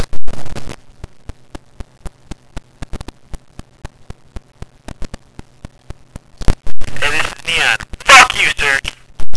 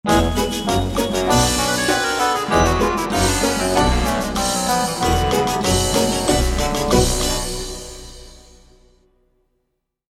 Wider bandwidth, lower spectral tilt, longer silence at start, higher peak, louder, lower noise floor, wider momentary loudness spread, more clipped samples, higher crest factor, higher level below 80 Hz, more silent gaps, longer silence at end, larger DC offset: second, 11 kHz vs 16.5 kHz; second, -1.5 dB/octave vs -4 dB/octave; about the same, 0 s vs 0.05 s; about the same, 0 dBFS vs -2 dBFS; first, -11 LUFS vs -18 LUFS; second, -30 dBFS vs -73 dBFS; first, 29 LU vs 5 LU; first, 3% vs under 0.1%; about the same, 12 dB vs 16 dB; about the same, -28 dBFS vs -28 dBFS; neither; second, 0 s vs 1.75 s; neither